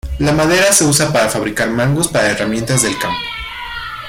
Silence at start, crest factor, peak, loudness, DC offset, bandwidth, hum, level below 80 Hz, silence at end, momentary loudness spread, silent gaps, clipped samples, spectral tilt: 0.05 s; 14 dB; 0 dBFS; -14 LUFS; under 0.1%; 16.5 kHz; none; -34 dBFS; 0 s; 14 LU; none; under 0.1%; -3.5 dB/octave